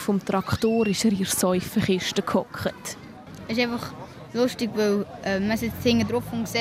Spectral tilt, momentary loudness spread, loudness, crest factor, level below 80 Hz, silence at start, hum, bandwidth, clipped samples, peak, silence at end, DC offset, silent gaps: -4.5 dB/octave; 13 LU; -25 LUFS; 16 dB; -52 dBFS; 0 s; none; 16 kHz; under 0.1%; -8 dBFS; 0 s; under 0.1%; none